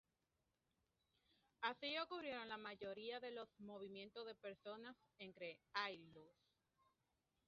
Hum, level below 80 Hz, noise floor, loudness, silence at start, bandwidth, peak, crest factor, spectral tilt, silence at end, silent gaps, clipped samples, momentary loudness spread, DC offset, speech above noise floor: none; under -90 dBFS; -89 dBFS; -51 LUFS; 1.6 s; 6.8 kHz; -28 dBFS; 26 dB; -0.5 dB/octave; 1.15 s; none; under 0.1%; 13 LU; under 0.1%; 37 dB